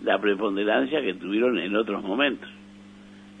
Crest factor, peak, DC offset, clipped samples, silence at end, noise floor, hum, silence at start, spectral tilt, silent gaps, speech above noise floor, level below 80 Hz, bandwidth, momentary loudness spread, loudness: 18 dB; -8 dBFS; under 0.1%; under 0.1%; 0 s; -47 dBFS; 50 Hz at -45 dBFS; 0 s; -6.5 dB/octave; none; 22 dB; -66 dBFS; 9.4 kHz; 4 LU; -25 LUFS